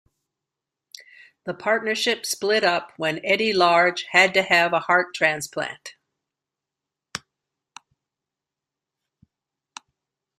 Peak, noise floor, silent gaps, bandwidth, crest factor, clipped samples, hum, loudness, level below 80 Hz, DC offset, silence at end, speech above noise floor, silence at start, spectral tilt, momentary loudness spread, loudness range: -2 dBFS; -87 dBFS; none; 15.5 kHz; 24 dB; under 0.1%; none; -20 LUFS; -70 dBFS; under 0.1%; 3.2 s; 66 dB; 1.45 s; -2.5 dB/octave; 19 LU; 10 LU